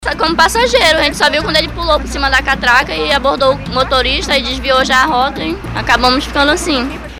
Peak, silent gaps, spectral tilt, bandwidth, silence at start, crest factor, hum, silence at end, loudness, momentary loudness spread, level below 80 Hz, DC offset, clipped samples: 0 dBFS; none; -3 dB/octave; 19.5 kHz; 0 s; 12 dB; none; 0 s; -12 LUFS; 5 LU; -26 dBFS; 0.1%; 0.2%